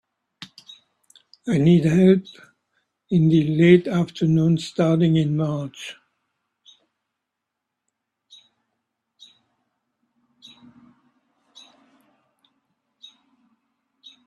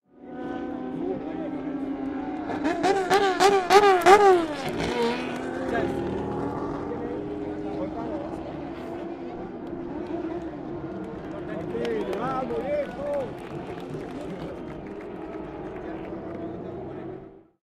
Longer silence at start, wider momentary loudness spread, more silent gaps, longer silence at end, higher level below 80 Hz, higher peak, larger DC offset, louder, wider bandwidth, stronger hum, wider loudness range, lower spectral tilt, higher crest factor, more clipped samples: first, 0.4 s vs 0.2 s; first, 21 LU vs 17 LU; neither; first, 8.35 s vs 0.25 s; second, -60 dBFS vs -52 dBFS; about the same, -2 dBFS vs 0 dBFS; neither; first, -19 LUFS vs -27 LUFS; second, 9.4 kHz vs 15.5 kHz; neither; second, 9 LU vs 15 LU; first, -8 dB/octave vs -5 dB/octave; about the same, 22 dB vs 26 dB; neither